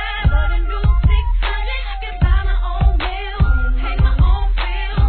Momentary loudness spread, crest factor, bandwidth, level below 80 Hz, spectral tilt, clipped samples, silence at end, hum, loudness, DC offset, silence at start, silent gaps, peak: 6 LU; 12 dB; 4.5 kHz; -16 dBFS; -9.5 dB/octave; under 0.1%; 0 s; none; -19 LUFS; 0.3%; 0 s; none; -2 dBFS